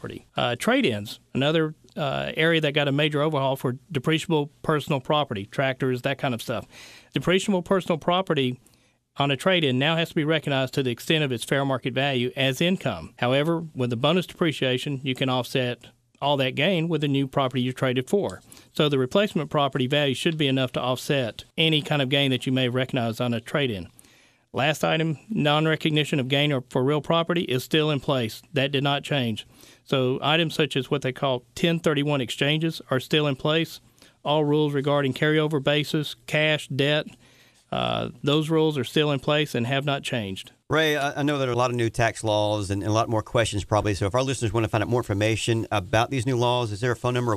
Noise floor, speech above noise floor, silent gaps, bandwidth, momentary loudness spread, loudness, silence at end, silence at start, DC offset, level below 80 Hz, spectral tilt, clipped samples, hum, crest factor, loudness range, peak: -58 dBFS; 34 dB; none; 14.5 kHz; 6 LU; -24 LUFS; 0 s; 0.05 s; under 0.1%; -54 dBFS; -5.5 dB/octave; under 0.1%; none; 18 dB; 2 LU; -6 dBFS